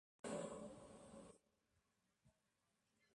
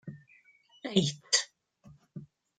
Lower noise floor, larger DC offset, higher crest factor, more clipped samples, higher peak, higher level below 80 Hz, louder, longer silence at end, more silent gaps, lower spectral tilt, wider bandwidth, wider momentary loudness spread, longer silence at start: first, -87 dBFS vs -63 dBFS; neither; second, 22 dB vs 28 dB; neither; second, -36 dBFS vs -8 dBFS; second, -82 dBFS vs -70 dBFS; second, -54 LUFS vs -29 LUFS; first, 0.85 s vs 0.35 s; neither; first, -4.5 dB/octave vs -3 dB/octave; about the same, 11 kHz vs 10 kHz; second, 13 LU vs 22 LU; first, 0.25 s vs 0.05 s